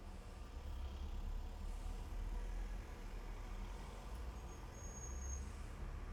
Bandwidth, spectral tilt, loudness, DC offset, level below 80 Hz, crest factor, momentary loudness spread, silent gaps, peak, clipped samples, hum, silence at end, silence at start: 14.5 kHz; -5 dB/octave; -51 LUFS; under 0.1%; -48 dBFS; 12 dB; 4 LU; none; -34 dBFS; under 0.1%; none; 0 s; 0 s